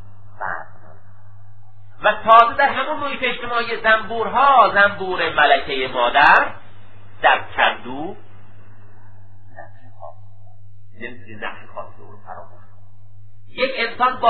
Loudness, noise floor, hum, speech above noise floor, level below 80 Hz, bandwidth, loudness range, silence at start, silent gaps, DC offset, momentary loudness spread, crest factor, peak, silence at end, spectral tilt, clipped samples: -16 LUFS; -47 dBFS; none; 30 dB; -50 dBFS; 7.8 kHz; 22 LU; 0.4 s; none; 3%; 23 LU; 20 dB; 0 dBFS; 0 s; -5.5 dB/octave; under 0.1%